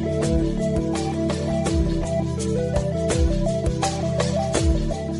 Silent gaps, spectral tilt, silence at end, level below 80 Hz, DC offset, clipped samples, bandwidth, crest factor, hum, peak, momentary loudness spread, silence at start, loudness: none; -6 dB/octave; 0 s; -28 dBFS; under 0.1%; under 0.1%; 11.5 kHz; 14 dB; none; -8 dBFS; 3 LU; 0 s; -23 LUFS